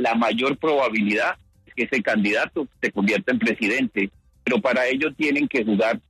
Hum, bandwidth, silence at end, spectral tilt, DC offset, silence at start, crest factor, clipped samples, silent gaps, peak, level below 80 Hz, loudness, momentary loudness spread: none; 13 kHz; 0.1 s; -5.5 dB/octave; under 0.1%; 0 s; 14 dB; under 0.1%; none; -10 dBFS; -60 dBFS; -22 LUFS; 6 LU